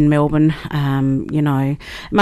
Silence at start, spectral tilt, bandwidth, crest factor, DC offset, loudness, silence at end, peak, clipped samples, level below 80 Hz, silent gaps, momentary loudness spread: 0 s; -8 dB/octave; 13 kHz; 14 dB; under 0.1%; -18 LUFS; 0 s; -2 dBFS; under 0.1%; -38 dBFS; none; 7 LU